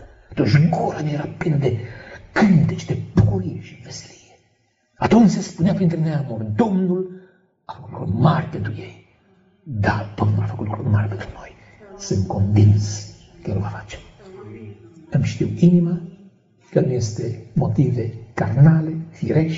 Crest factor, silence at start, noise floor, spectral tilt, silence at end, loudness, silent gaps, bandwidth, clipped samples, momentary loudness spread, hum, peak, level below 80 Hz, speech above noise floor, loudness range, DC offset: 18 dB; 0 s; -64 dBFS; -8 dB/octave; 0 s; -20 LUFS; none; 7.8 kHz; under 0.1%; 20 LU; none; -2 dBFS; -46 dBFS; 45 dB; 4 LU; under 0.1%